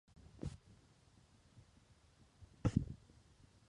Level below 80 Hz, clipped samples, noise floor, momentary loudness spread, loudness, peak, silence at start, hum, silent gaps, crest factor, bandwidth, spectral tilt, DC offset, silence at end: -58 dBFS; under 0.1%; -68 dBFS; 28 LU; -44 LUFS; -18 dBFS; 0.35 s; none; none; 28 dB; 11 kHz; -8 dB/octave; under 0.1%; 0.75 s